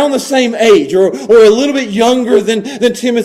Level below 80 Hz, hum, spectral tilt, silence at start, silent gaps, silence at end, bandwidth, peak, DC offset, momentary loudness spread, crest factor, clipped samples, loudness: -50 dBFS; none; -4 dB/octave; 0 s; none; 0 s; 15 kHz; 0 dBFS; under 0.1%; 7 LU; 10 dB; 0.1%; -10 LUFS